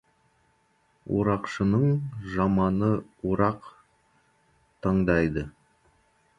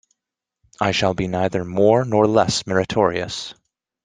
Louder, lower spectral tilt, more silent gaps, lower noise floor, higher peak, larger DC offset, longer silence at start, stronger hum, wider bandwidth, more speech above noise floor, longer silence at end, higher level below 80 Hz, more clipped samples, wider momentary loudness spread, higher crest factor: second, -26 LUFS vs -19 LUFS; first, -9 dB/octave vs -5 dB/octave; neither; second, -67 dBFS vs -85 dBFS; second, -8 dBFS vs -2 dBFS; neither; first, 1.05 s vs 0.8 s; neither; second, 7.6 kHz vs 10 kHz; second, 42 dB vs 66 dB; first, 0.9 s vs 0.55 s; about the same, -48 dBFS vs -50 dBFS; neither; about the same, 10 LU vs 10 LU; about the same, 20 dB vs 18 dB